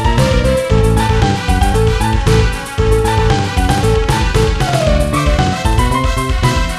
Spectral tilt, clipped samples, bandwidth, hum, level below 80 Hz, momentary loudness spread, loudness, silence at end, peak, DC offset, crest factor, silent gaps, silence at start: -5.5 dB/octave; under 0.1%; 14 kHz; none; -16 dBFS; 2 LU; -14 LUFS; 0 s; 0 dBFS; under 0.1%; 12 dB; none; 0 s